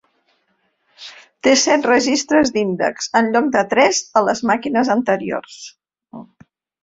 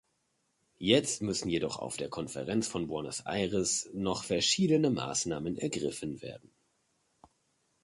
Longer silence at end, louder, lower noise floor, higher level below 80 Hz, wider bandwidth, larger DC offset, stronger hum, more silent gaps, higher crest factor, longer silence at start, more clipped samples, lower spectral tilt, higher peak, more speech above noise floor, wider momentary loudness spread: second, 0.6 s vs 1.45 s; first, -16 LUFS vs -31 LUFS; second, -66 dBFS vs -77 dBFS; about the same, -58 dBFS vs -62 dBFS; second, 7.8 kHz vs 11.5 kHz; neither; neither; neither; second, 18 dB vs 24 dB; first, 1 s vs 0.8 s; neither; about the same, -3 dB/octave vs -4 dB/octave; first, 0 dBFS vs -10 dBFS; first, 50 dB vs 45 dB; first, 22 LU vs 11 LU